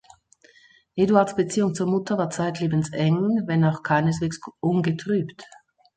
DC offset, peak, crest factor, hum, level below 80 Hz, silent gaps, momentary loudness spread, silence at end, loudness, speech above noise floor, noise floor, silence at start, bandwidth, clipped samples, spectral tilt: under 0.1%; -4 dBFS; 20 dB; none; -58 dBFS; none; 7 LU; 0.5 s; -23 LUFS; 34 dB; -56 dBFS; 0.95 s; 9.2 kHz; under 0.1%; -6.5 dB/octave